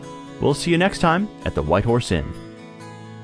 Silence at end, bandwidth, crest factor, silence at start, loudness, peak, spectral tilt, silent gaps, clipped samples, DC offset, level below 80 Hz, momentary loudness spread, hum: 0 s; 11 kHz; 18 dB; 0 s; -20 LUFS; -4 dBFS; -6 dB/octave; none; under 0.1%; under 0.1%; -38 dBFS; 20 LU; none